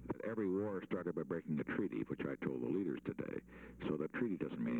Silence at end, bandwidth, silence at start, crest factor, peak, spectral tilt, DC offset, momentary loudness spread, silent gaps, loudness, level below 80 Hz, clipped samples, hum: 0 s; 8 kHz; 0 s; 16 dB; -24 dBFS; -9 dB/octave; under 0.1%; 6 LU; none; -41 LUFS; -68 dBFS; under 0.1%; none